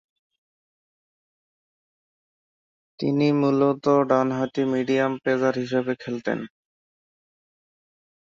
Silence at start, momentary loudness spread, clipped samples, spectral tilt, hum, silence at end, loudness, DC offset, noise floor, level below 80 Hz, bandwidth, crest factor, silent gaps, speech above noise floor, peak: 3 s; 9 LU; under 0.1%; -7.5 dB/octave; none; 1.8 s; -23 LUFS; under 0.1%; under -90 dBFS; -68 dBFS; 7.4 kHz; 20 dB; none; over 68 dB; -6 dBFS